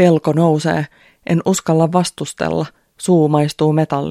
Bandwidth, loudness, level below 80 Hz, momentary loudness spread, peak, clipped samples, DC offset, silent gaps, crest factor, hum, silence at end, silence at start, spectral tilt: 14 kHz; -16 LUFS; -52 dBFS; 10 LU; 0 dBFS; under 0.1%; under 0.1%; none; 16 dB; none; 0 s; 0 s; -6.5 dB/octave